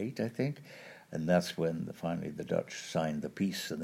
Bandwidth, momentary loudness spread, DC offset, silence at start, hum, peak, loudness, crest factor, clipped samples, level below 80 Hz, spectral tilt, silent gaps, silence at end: 16 kHz; 11 LU; under 0.1%; 0 s; none; -14 dBFS; -35 LUFS; 22 dB; under 0.1%; -68 dBFS; -6 dB/octave; none; 0 s